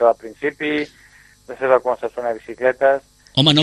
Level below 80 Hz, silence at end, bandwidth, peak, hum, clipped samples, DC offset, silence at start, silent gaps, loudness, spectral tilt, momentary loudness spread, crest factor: -56 dBFS; 0 s; 12.5 kHz; 0 dBFS; none; under 0.1%; under 0.1%; 0 s; none; -20 LUFS; -5.5 dB/octave; 10 LU; 20 dB